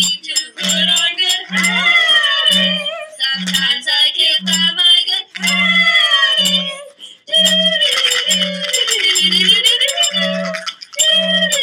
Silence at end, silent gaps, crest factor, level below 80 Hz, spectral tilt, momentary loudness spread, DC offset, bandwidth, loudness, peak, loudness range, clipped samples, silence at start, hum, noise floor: 0 s; none; 14 dB; -66 dBFS; -1 dB/octave; 8 LU; under 0.1%; 18.5 kHz; -12 LUFS; 0 dBFS; 1 LU; under 0.1%; 0 s; none; -36 dBFS